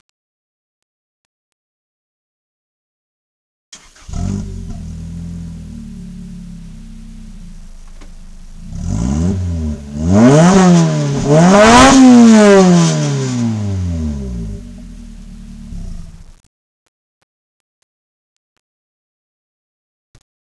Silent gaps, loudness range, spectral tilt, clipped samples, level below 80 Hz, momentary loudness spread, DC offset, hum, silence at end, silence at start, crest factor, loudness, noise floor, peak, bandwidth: none; 24 LU; -5.5 dB/octave; under 0.1%; -32 dBFS; 26 LU; under 0.1%; none; 4.3 s; 3.7 s; 14 dB; -10 LUFS; -32 dBFS; 0 dBFS; 11 kHz